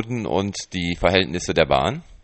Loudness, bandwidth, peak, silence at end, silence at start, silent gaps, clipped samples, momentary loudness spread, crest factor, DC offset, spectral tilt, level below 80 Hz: -21 LUFS; 8.8 kHz; -2 dBFS; 0.05 s; 0 s; none; under 0.1%; 7 LU; 20 dB; under 0.1%; -4.5 dB/octave; -40 dBFS